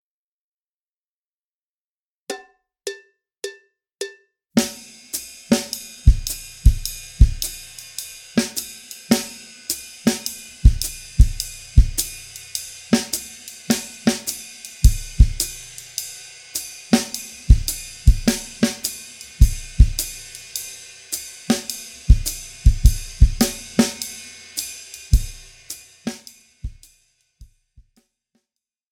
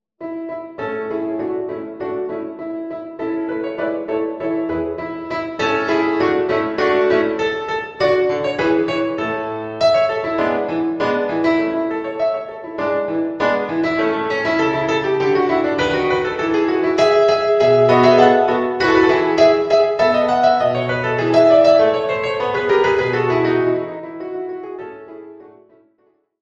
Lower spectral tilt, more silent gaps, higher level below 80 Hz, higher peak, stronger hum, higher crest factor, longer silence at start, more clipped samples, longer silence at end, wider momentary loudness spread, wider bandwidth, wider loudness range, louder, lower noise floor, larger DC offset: second, -4.5 dB/octave vs -6 dB/octave; neither; first, -22 dBFS vs -52 dBFS; about the same, 0 dBFS vs 0 dBFS; neither; about the same, 20 dB vs 18 dB; first, 2.3 s vs 0.2 s; neither; first, 1.5 s vs 0.9 s; about the same, 16 LU vs 14 LU; first, 18.5 kHz vs 7.8 kHz; about the same, 10 LU vs 10 LU; second, -22 LUFS vs -17 LUFS; first, under -90 dBFS vs -61 dBFS; neither